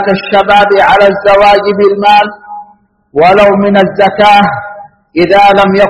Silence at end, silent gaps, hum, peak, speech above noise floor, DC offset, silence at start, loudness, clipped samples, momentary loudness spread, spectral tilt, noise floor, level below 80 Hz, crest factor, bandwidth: 0 s; none; none; 0 dBFS; 37 dB; under 0.1%; 0 s; -6 LUFS; 2%; 11 LU; -6 dB/octave; -43 dBFS; -38 dBFS; 6 dB; 10.5 kHz